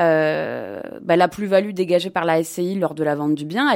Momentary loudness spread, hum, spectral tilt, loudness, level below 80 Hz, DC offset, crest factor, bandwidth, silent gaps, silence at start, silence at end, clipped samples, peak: 9 LU; none; -5.5 dB/octave; -20 LUFS; -64 dBFS; under 0.1%; 16 dB; 16.5 kHz; none; 0 s; 0 s; under 0.1%; -4 dBFS